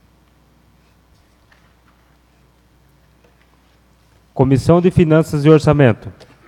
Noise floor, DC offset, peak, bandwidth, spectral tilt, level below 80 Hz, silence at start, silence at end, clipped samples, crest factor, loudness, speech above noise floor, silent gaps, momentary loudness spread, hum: -53 dBFS; under 0.1%; 0 dBFS; 12.5 kHz; -8 dB/octave; -42 dBFS; 4.35 s; 0.35 s; under 0.1%; 18 dB; -13 LUFS; 41 dB; none; 15 LU; none